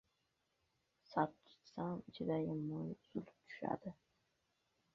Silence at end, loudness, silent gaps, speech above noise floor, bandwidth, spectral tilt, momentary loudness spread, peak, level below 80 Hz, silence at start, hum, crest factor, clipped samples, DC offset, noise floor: 1 s; -44 LUFS; none; 40 dB; 7 kHz; -6.5 dB/octave; 10 LU; -22 dBFS; -78 dBFS; 1.1 s; none; 24 dB; under 0.1%; under 0.1%; -84 dBFS